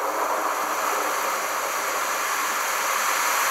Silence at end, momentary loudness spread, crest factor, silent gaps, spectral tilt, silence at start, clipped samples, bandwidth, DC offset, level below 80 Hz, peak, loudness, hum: 0 s; 3 LU; 14 dB; none; 1 dB/octave; 0 s; under 0.1%; 16 kHz; under 0.1%; -76 dBFS; -10 dBFS; -23 LUFS; none